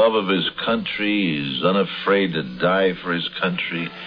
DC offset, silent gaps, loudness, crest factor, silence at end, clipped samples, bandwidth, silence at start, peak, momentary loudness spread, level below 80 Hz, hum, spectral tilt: under 0.1%; none; -21 LUFS; 18 dB; 0 s; under 0.1%; 5.4 kHz; 0 s; -4 dBFS; 5 LU; -56 dBFS; none; -8 dB/octave